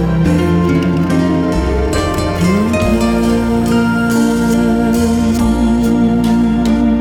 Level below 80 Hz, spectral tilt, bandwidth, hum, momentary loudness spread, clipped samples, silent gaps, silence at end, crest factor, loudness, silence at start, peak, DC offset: -24 dBFS; -6.5 dB/octave; 16.5 kHz; none; 2 LU; under 0.1%; none; 0 s; 10 dB; -13 LUFS; 0 s; -2 dBFS; under 0.1%